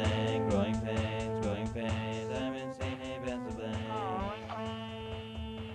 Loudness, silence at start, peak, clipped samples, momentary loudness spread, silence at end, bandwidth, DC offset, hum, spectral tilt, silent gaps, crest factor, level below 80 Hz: -36 LUFS; 0 s; -18 dBFS; under 0.1%; 10 LU; 0 s; 10.5 kHz; under 0.1%; none; -6.5 dB/octave; none; 16 dB; -50 dBFS